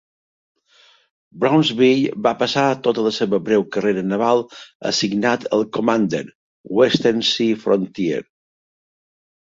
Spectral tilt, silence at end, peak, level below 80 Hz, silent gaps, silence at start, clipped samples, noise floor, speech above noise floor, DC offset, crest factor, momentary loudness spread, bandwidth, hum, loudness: -5 dB/octave; 1.2 s; -2 dBFS; -62 dBFS; 4.75-4.80 s, 6.35-6.64 s; 1.35 s; under 0.1%; -54 dBFS; 36 dB; under 0.1%; 18 dB; 8 LU; 7.8 kHz; none; -19 LUFS